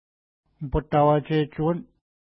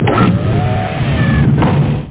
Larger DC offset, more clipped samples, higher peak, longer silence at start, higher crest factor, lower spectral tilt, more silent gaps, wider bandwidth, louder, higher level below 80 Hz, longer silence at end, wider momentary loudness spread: neither; neither; second, -8 dBFS vs 0 dBFS; first, 0.6 s vs 0 s; first, 18 dB vs 12 dB; about the same, -12 dB/octave vs -11.5 dB/octave; neither; first, 5.6 kHz vs 4 kHz; second, -24 LUFS vs -13 LUFS; second, -42 dBFS vs -24 dBFS; first, 0.5 s vs 0 s; first, 11 LU vs 5 LU